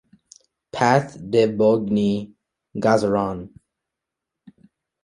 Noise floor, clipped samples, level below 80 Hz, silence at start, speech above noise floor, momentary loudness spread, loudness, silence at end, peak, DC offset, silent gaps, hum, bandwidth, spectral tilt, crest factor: -84 dBFS; under 0.1%; -56 dBFS; 0.75 s; 65 dB; 17 LU; -20 LUFS; 1.55 s; -2 dBFS; under 0.1%; none; none; 11.5 kHz; -6.5 dB/octave; 20 dB